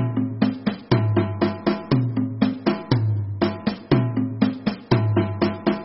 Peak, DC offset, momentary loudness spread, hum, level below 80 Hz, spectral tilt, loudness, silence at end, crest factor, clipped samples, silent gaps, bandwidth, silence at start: -4 dBFS; under 0.1%; 4 LU; none; -48 dBFS; -11 dB/octave; -23 LUFS; 0 s; 18 dB; under 0.1%; none; 5.8 kHz; 0 s